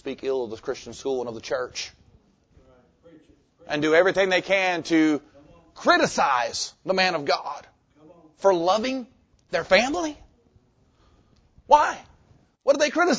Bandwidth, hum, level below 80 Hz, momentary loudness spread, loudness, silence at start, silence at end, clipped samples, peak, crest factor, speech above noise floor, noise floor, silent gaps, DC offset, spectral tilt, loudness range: 8 kHz; none; -58 dBFS; 13 LU; -23 LUFS; 0.05 s; 0 s; under 0.1%; -2 dBFS; 22 dB; 39 dB; -61 dBFS; none; under 0.1%; -3.5 dB/octave; 6 LU